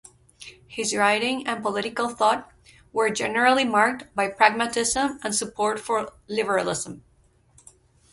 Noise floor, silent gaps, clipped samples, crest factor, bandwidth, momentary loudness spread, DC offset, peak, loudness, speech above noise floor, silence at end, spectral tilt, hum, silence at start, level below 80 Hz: -60 dBFS; none; under 0.1%; 24 dB; 12 kHz; 11 LU; under 0.1%; 0 dBFS; -23 LUFS; 36 dB; 1.15 s; -2.5 dB/octave; none; 0.4 s; -58 dBFS